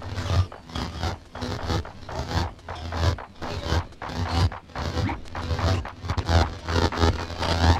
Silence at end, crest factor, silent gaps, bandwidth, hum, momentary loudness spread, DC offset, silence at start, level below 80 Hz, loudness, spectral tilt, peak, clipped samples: 0 s; 20 dB; none; 11 kHz; none; 10 LU; under 0.1%; 0 s; -32 dBFS; -27 LUFS; -5.5 dB/octave; -6 dBFS; under 0.1%